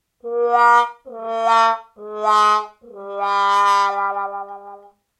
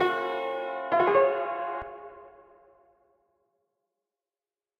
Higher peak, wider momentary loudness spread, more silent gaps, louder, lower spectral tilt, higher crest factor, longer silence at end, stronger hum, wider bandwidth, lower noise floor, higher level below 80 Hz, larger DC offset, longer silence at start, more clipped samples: first, -2 dBFS vs -12 dBFS; about the same, 19 LU vs 20 LU; neither; first, -17 LUFS vs -27 LUFS; second, -1 dB/octave vs -6 dB/octave; about the same, 16 dB vs 20 dB; second, 0.45 s vs 2.5 s; neither; first, 13.5 kHz vs 6 kHz; second, -43 dBFS vs under -90 dBFS; second, -76 dBFS vs -66 dBFS; neither; first, 0.25 s vs 0 s; neither